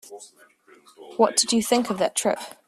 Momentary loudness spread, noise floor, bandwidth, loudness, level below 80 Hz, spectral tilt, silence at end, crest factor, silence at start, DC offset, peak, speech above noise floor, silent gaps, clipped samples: 19 LU; -51 dBFS; 15.5 kHz; -22 LUFS; -66 dBFS; -2.5 dB/octave; 0.15 s; 20 dB; 0.1 s; under 0.1%; -4 dBFS; 28 dB; none; under 0.1%